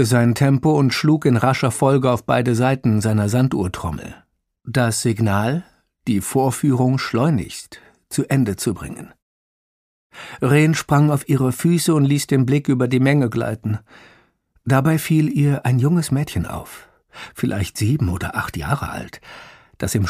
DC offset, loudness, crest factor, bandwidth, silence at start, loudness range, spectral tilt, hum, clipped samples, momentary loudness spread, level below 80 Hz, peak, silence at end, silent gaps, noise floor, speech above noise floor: under 0.1%; -19 LUFS; 18 dB; 15.5 kHz; 0 s; 6 LU; -6 dB/octave; none; under 0.1%; 15 LU; -46 dBFS; 0 dBFS; 0 s; 9.22-10.10 s; -58 dBFS; 40 dB